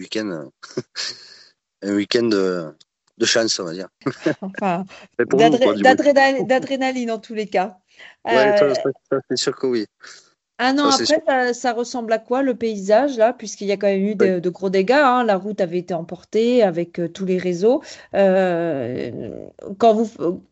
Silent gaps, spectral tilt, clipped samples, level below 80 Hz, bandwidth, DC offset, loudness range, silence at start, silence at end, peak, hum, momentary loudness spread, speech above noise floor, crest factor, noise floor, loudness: none; -4.5 dB/octave; under 0.1%; -66 dBFS; 8.2 kHz; under 0.1%; 4 LU; 0 s; 0.1 s; 0 dBFS; none; 13 LU; 31 dB; 20 dB; -50 dBFS; -19 LUFS